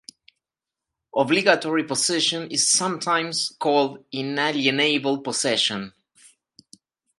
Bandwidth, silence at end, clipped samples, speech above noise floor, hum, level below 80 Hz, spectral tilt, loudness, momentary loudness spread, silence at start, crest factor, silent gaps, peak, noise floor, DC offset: 11.5 kHz; 1.3 s; under 0.1%; 66 dB; none; -72 dBFS; -2 dB/octave; -21 LUFS; 8 LU; 1.15 s; 24 dB; none; 0 dBFS; -88 dBFS; under 0.1%